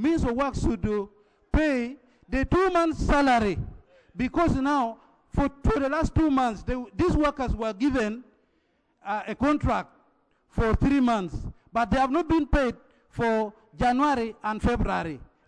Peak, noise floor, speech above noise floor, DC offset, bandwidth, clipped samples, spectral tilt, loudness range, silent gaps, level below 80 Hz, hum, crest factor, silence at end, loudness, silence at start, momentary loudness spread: -12 dBFS; -69 dBFS; 45 dB; under 0.1%; 10.5 kHz; under 0.1%; -7 dB/octave; 3 LU; none; -36 dBFS; none; 14 dB; 0.25 s; -26 LUFS; 0 s; 12 LU